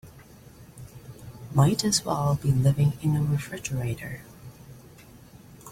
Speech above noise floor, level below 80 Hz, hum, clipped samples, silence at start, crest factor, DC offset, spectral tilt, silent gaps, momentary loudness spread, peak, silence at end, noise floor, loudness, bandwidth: 25 dB; -52 dBFS; none; under 0.1%; 0.05 s; 18 dB; under 0.1%; -5.5 dB/octave; none; 24 LU; -8 dBFS; 0 s; -49 dBFS; -25 LUFS; 16 kHz